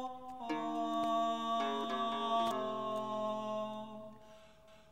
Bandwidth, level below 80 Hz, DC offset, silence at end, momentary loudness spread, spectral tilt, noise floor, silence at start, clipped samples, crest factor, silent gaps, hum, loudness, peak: 16 kHz; -74 dBFS; 0.1%; 0 s; 12 LU; -4.5 dB/octave; -61 dBFS; 0 s; under 0.1%; 16 dB; none; none; -37 LUFS; -22 dBFS